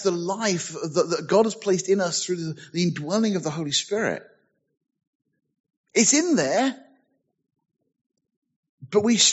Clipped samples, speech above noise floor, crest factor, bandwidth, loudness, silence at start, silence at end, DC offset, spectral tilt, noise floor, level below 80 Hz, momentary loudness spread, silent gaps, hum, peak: under 0.1%; 47 dB; 20 dB; 8.2 kHz; -23 LUFS; 0 s; 0 s; under 0.1%; -3.5 dB/octave; -70 dBFS; -72 dBFS; 10 LU; 5.07-5.20 s, 5.60-5.64 s, 5.77-5.84 s, 8.06-8.10 s, 8.37-8.42 s, 8.56-8.63 s, 8.69-8.78 s; none; -6 dBFS